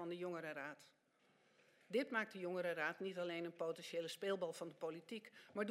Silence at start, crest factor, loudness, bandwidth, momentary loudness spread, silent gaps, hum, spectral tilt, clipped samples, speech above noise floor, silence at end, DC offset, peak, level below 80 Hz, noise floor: 0 s; 20 dB; -45 LUFS; 16 kHz; 10 LU; none; none; -4.5 dB/octave; under 0.1%; 31 dB; 0 s; under 0.1%; -26 dBFS; under -90 dBFS; -76 dBFS